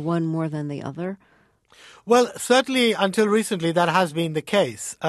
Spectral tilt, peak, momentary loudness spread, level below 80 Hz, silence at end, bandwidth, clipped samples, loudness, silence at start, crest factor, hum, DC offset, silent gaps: -4.5 dB/octave; -4 dBFS; 12 LU; -66 dBFS; 0 s; 13 kHz; under 0.1%; -22 LUFS; 0 s; 18 dB; none; under 0.1%; none